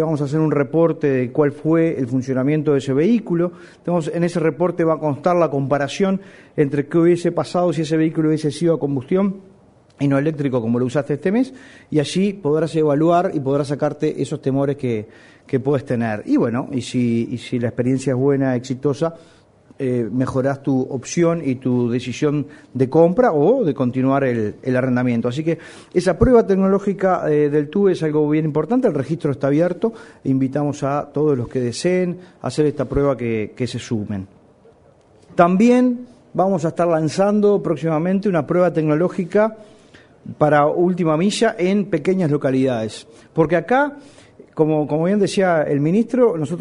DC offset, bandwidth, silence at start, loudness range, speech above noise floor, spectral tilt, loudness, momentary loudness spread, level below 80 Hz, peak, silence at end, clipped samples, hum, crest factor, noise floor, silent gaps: under 0.1%; 11 kHz; 0 s; 4 LU; 33 dB; -7 dB/octave; -19 LUFS; 8 LU; -46 dBFS; 0 dBFS; 0 s; under 0.1%; none; 18 dB; -51 dBFS; none